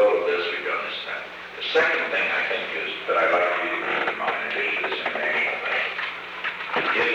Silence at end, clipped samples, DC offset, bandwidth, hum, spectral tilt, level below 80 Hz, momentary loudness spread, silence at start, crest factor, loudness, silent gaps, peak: 0 s; under 0.1%; under 0.1%; 9.2 kHz; 60 Hz at -60 dBFS; -3.5 dB/octave; -66 dBFS; 9 LU; 0 s; 16 dB; -24 LUFS; none; -10 dBFS